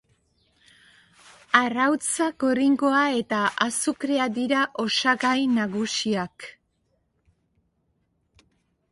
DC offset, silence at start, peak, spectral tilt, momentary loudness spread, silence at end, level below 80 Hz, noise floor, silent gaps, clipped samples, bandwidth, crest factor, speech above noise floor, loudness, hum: under 0.1%; 1.55 s; -2 dBFS; -3 dB/octave; 5 LU; 2.4 s; -68 dBFS; -71 dBFS; none; under 0.1%; 11.5 kHz; 24 dB; 48 dB; -23 LUFS; none